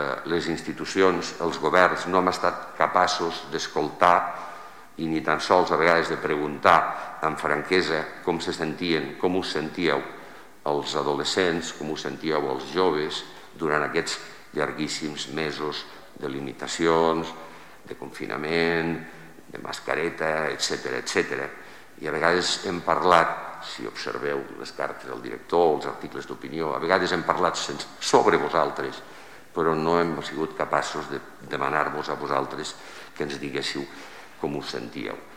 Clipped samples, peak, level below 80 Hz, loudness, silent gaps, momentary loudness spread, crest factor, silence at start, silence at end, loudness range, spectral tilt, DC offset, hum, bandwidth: under 0.1%; -4 dBFS; -58 dBFS; -25 LUFS; none; 15 LU; 22 dB; 0 s; 0 s; 6 LU; -4 dB/octave; 0.4%; none; 16 kHz